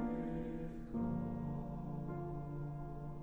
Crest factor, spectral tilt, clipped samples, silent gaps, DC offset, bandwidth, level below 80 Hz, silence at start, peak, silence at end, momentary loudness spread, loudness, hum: 14 dB; -10.5 dB/octave; under 0.1%; none; under 0.1%; 4.1 kHz; -52 dBFS; 0 s; -28 dBFS; 0 s; 6 LU; -43 LUFS; none